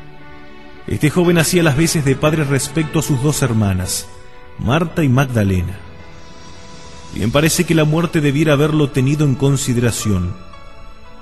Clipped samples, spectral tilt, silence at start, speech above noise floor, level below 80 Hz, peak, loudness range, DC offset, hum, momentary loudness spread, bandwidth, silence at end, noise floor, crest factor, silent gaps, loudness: under 0.1%; -5.5 dB/octave; 0 s; 24 dB; -38 dBFS; 0 dBFS; 4 LU; 2%; none; 14 LU; 13 kHz; 0.1 s; -39 dBFS; 16 dB; none; -16 LUFS